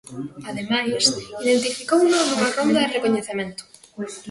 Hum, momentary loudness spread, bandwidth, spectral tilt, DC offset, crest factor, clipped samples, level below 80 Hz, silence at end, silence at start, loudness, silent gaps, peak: none; 15 LU; 11.5 kHz; -3 dB/octave; under 0.1%; 18 dB; under 0.1%; -62 dBFS; 0 s; 0.05 s; -20 LUFS; none; -4 dBFS